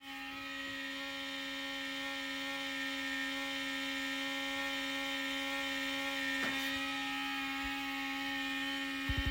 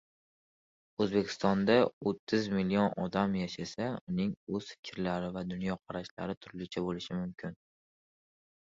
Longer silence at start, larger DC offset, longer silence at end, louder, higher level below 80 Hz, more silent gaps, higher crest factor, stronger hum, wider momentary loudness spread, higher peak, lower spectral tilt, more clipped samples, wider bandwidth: second, 0 s vs 1 s; neither; second, 0 s vs 1.2 s; second, -37 LUFS vs -33 LUFS; first, -56 dBFS vs -62 dBFS; second, none vs 1.93-2.01 s, 2.19-2.27 s, 4.01-4.07 s, 4.37-4.47 s, 4.79-4.83 s, 6.11-6.17 s, 6.37-6.41 s; second, 16 dB vs 22 dB; neither; second, 5 LU vs 12 LU; second, -24 dBFS vs -12 dBFS; second, -2.5 dB/octave vs -6.5 dB/octave; neither; first, 16 kHz vs 7.6 kHz